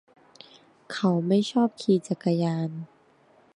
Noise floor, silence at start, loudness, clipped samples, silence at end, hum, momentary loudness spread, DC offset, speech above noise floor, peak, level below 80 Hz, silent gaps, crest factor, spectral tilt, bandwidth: -60 dBFS; 0.9 s; -25 LUFS; under 0.1%; 0.7 s; none; 14 LU; under 0.1%; 35 dB; -10 dBFS; -76 dBFS; none; 16 dB; -7 dB/octave; 11 kHz